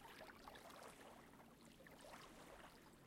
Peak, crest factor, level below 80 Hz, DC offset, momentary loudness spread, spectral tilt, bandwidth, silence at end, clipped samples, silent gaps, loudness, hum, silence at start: -44 dBFS; 18 dB; -76 dBFS; under 0.1%; 5 LU; -3.5 dB/octave; 16 kHz; 0 s; under 0.1%; none; -61 LUFS; none; 0 s